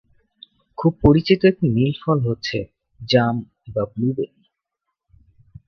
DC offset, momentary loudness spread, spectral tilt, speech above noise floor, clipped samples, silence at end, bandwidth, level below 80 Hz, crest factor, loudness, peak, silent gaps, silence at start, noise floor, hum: under 0.1%; 14 LU; -8 dB/octave; 61 dB; under 0.1%; 1.4 s; 6.8 kHz; -40 dBFS; 20 dB; -20 LUFS; 0 dBFS; none; 0.8 s; -80 dBFS; none